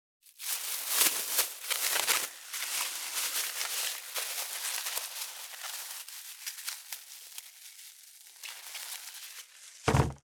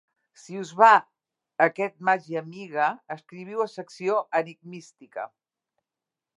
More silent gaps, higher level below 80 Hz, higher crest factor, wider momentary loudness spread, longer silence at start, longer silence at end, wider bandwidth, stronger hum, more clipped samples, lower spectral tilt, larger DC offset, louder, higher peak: neither; first, -54 dBFS vs -88 dBFS; first, 28 dB vs 22 dB; second, 18 LU vs 22 LU; second, 0.25 s vs 0.5 s; second, 0.05 s vs 1.1 s; first, over 20 kHz vs 11 kHz; neither; neither; second, -1.5 dB/octave vs -5 dB/octave; neither; second, -32 LUFS vs -24 LUFS; second, -8 dBFS vs -4 dBFS